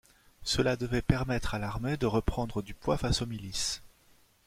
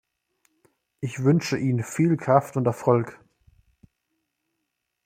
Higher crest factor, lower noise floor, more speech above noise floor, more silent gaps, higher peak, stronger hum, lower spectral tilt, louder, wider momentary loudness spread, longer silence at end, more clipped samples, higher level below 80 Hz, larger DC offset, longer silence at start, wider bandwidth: about the same, 20 dB vs 24 dB; second, -63 dBFS vs -80 dBFS; second, 33 dB vs 57 dB; neither; second, -10 dBFS vs -2 dBFS; neither; second, -5 dB/octave vs -7 dB/octave; second, -32 LUFS vs -23 LUFS; second, 7 LU vs 11 LU; second, 0.6 s vs 1.9 s; neither; first, -42 dBFS vs -64 dBFS; neither; second, 0.4 s vs 1 s; about the same, 16 kHz vs 15.5 kHz